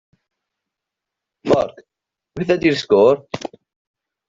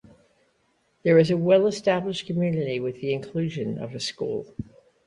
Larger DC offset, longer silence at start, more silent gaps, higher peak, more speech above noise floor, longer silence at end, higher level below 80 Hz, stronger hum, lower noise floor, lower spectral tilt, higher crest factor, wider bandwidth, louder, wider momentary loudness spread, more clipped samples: neither; first, 1.45 s vs 1.05 s; neither; first, -2 dBFS vs -6 dBFS; first, 67 dB vs 44 dB; first, 0.9 s vs 0.45 s; about the same, -56 dBFS vs -58 dBFS; neither; first, -84 dBFS vs -68 dBFS; about the same, -6 dB/octave vs -6.5 dB/octave; about the same, 18 dB vs 20 dB; second, 7.6 kHz vs 11 kHz; first, -17 LUFS vs -24 LUFS; first, 17 LU vs 12 LU; neither